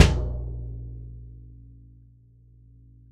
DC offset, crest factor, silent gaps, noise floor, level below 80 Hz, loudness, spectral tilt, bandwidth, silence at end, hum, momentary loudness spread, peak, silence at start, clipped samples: under 0.1%; 26 dB; none; -54 dBFS; -34 dBFS; -30 LUFS; -5.5 dB/octave; 12 kHz; 1.6 s; none; 22 LU; 0 dBFS; 0 s; under 0.1%